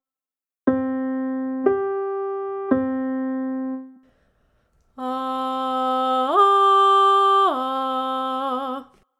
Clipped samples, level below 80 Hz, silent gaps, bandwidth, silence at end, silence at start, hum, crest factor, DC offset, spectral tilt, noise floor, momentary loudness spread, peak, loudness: under 0.1%; -64 dBFS; none; 12 kHz; 0.35 s; 0.65 s; none; 18 dB; under 0.1%; -5 dB/octave; under -90 dBFS; 13 LU; -4 dBFS; -21 LUFS